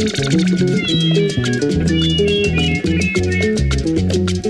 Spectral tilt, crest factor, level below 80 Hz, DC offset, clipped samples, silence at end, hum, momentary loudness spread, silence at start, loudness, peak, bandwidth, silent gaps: -5.5 dB/octave; 12 dB; -28 dBFS; under 0.1%; under 0.1%; 0 s; none; 3 LU; 0 s; -16 LUFS; -4 dBFS; 11.5 kHz; none